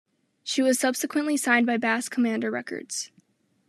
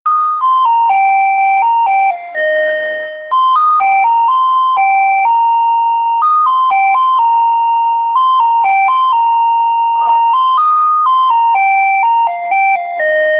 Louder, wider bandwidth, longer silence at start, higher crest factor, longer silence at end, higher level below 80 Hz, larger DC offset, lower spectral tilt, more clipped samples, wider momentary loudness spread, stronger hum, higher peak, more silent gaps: second, -25 LUFS vs -11 LUFS; first, 13.5 kHz vs 5.2 kHz; first, 0.45 s vs 0.05 s; first, 20 dB vs 8 dB; first, 0.65 s vs 0 s; second, -84 dBFS vs -72 dBFS; neither; second, -2.5 dB/octave vs -5 dB/octave; neither; first, 11 LU vs 3 LU; neither; about the same, -6 dBFS vs -4 dBFS; neither